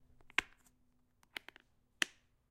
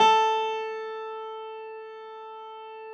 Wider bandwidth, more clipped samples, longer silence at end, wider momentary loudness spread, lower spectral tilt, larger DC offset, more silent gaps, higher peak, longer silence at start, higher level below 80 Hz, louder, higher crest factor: first, 15.5 kHz vs 8.2 kHz; neither; first, 0.45 s vs 0 s; about the same, 18 LU vs 18 LU; second, 0 dB/octave vs -1.5 dB/octave; neither; neither; about the same, -10 dBFS vs -10 dBFS; first, 0.4 s vs 0 s; first, -70 dBFS vs under -90 dBFS; second, -41 LUFS vs -28 LUFS; first, 36 dB vs 18 dB